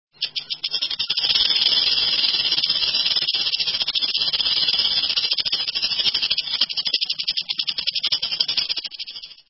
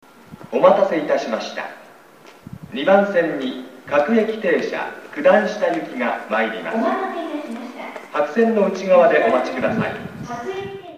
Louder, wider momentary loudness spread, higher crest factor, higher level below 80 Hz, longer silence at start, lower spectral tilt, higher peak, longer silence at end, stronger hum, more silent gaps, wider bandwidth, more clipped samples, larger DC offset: about the same, -19 LUFS vs -19 LUFS; second, 8 LU vs 16 LU; about the same, 18 dB vs 20 dB; about the same, -58 dBFS vs -62 dBFS; about the same, 0.2 s vs 0.3 s; second, -2.5 dB/octave vs -6 dB/octave; second, -4 dBFS vs 0 dBFS; first, 0.15 s vs 0 s; neither; neither; second, 6 kHz vs 11 kHz; neither; neither